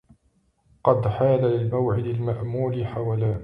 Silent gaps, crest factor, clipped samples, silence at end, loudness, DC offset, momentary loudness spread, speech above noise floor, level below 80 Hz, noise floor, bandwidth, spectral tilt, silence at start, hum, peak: none; 18 dB; under 0.1%; 0 s; -24 LUFS; under 0.1%; 6 LU; 43 dB; -48 dBFS; -66 dBFS; 4.5 kHz; -11 dB/octave; 0.85 s; none; -4 dBFS